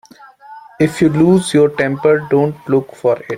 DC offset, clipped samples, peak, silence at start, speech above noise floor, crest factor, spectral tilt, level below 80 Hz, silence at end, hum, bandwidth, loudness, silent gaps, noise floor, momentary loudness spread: under 0.1%; under 0.1%; -2 dBFS; 0.5 s; 26 dB; 12 dB; -6.5 dB/octave; -50 dBFS; 0 s; none; 15.5 kHz; -14 LUFS; none; -40 dBFS; 6 LU